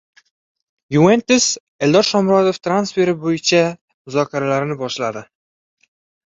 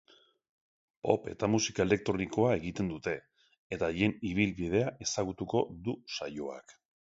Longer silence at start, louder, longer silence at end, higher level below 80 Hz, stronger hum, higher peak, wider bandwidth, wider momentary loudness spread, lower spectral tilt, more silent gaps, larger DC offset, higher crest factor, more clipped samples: second, 0.9 s vs 1.05 s; first, -17 LUFS vs -32 LUFS; first, 1.1 s vs 0.4 s; about the same, -58 dBFS vs -56 dBFS; neither; first, -2 dBFS vs -10 dBFS; about the same, 8.2 kHz vs 8 kHz; about the same, 9 LU vs 10 LU; about the same, -4.5 dB/octave vs -5 dB/octave; first, 1.60-1.79 s, 3.81-3.88 s, 3.94-4.05 s vs 3.58-3.70 s; neither; second, 16 dB vs 22 dB; neither